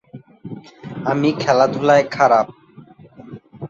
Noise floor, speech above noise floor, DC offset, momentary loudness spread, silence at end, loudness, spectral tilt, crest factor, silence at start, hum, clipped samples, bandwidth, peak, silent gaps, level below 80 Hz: -44 dBFS; 29 dB; under 0.1%; 21 LU; 0 s; -16 LUFS; -6 dB/octave; 18 dB; 0.15 s; none; under 0.1%; 7.6 kHz; -2 dBFS; none; -60 dBFS